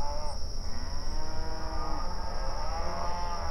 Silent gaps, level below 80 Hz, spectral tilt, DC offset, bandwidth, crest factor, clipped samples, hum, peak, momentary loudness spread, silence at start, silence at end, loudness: none; -32 dBFS; -4.5 dB/octave; under 0.1%; 11 kHz; 10 dB; under 0.1%; none; -18 dBFS; 4 LU; 0 s; 0 s; -37 LUFS